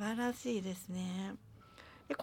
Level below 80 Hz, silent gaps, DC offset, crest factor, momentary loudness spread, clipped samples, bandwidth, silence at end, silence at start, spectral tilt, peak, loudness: -70 dBFS; none; under 0.1%; 16 dB; 20 LU; under 0.1%; 17.5 kHz; 0 s; 0 s; -5.5 dB/octave; -24 dBFS; -40 LUFS